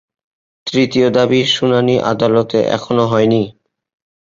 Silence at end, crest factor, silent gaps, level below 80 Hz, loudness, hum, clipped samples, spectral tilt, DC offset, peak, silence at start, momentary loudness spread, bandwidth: 0.8 s; 14 dB; none; -52 dBFS; -14 LUFS; none; under 0.1%; -6 dB/octave; under 0.1%; -2 dBFS; 0.65 s; 5 LU; 7.6 kHz